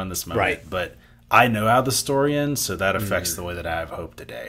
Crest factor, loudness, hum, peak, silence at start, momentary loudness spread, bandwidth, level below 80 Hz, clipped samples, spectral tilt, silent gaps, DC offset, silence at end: 22 dB; -22 LUFS; none; -2 dBFS; 0 s; 12 LU; 16 kHz; -46 dBFS; under 0.1%; -4 dB/octave; none; under 0.1%; 0 s